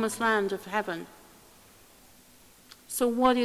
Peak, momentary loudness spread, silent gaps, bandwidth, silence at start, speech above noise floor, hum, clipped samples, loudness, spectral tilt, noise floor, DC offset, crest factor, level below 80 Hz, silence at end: -8 dBFS; 13 LU; none; 16 kHz; 0 s; 29 dB; none; under 0.1%; -28 LUFS; -3.5 dB/octave; -56 dBFS; under 0.1%; 22 dB; -64 dBFS; 0 s